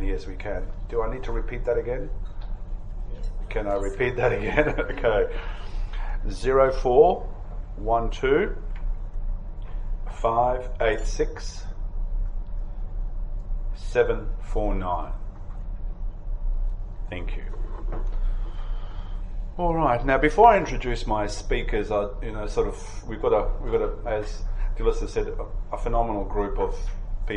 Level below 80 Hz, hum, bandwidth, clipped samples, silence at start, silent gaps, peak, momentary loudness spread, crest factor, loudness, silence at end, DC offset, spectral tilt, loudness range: -28 dBFS; none; 9 kHz; under 0.1%; 0 s; none; -2 dBFS; 16 LU; 22 dB; -26 LUFS; 0 s; under 0.1%; -6 dB/octave; 10 LU